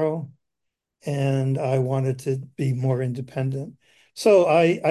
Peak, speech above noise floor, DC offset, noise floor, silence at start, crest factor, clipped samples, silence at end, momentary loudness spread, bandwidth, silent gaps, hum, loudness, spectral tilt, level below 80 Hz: -6 dBFS; 60 dB; under 0.1%; -82 dBFS; 0 s; 16 dB; under 0.1%; 0 s; 15 LU; 12.5 kHz; none; none; -23 LUFS; -7 dB/octave; -64 dBFS